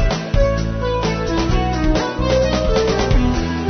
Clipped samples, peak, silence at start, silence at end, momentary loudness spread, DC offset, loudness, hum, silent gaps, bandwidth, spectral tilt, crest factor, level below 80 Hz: under 0.1%; -4 dBFS; 0 s; 0 s; 3 LU; under 0.1%; -18 LUFS; none; none; 6.6 kHz; -6 dB/octave; 14 dB; -22 dBFS